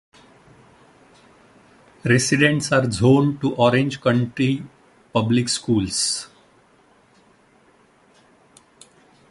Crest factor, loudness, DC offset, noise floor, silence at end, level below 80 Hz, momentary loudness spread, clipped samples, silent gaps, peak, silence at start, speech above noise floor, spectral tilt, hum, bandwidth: 20 dB; -19 LUFS; under 0.1%; -56 dBFS; 3.05 s; -52 dBFS; 10 LU; under 0.1%; none; -2 dBFS; 2.05 s; 37 dB; -5 dB/octave; none; 11.5 kHz